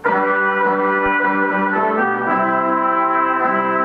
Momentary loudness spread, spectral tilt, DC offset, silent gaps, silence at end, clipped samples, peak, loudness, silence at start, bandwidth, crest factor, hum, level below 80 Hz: 1 LU; -8 dB/octave; under 0.1%; none; 0 s; under 0.1%; -4 dBFS; -16 LUFS; 0 s; 5.6 kHz; 12 dB; none; -52 dBFS